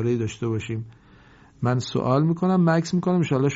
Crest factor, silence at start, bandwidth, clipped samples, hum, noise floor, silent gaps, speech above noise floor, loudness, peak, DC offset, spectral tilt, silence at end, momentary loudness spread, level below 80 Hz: 16 dB; 0 s; 8 kHz; under 0.1%; none; -51 dBFS; none; 29 dB; -23 LUFS; -6 dBFS; under 0.1%; -7 dB/octave; 0 s; 10 LU; -56 dBFS